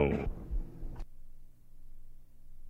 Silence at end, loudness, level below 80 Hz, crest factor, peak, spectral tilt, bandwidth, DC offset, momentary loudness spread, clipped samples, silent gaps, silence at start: 0 s; -40 LUFS; -42 dBFS; 22 dB; -14 dBFS; -9 dB/octave; 5.4 kHz; under 0.1%; 25 LU; under 0.1%; none; 0 s